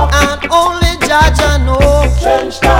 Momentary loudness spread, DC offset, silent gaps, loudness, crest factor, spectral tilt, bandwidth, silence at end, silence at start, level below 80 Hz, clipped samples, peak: 3 LU; under 0.1%; none; -11 LUFS; 10 dB; -4.5 dB/octave; 16.5 kHz; 0 s; 0 s; -14 dBFS; 0.4%; 0 dBFS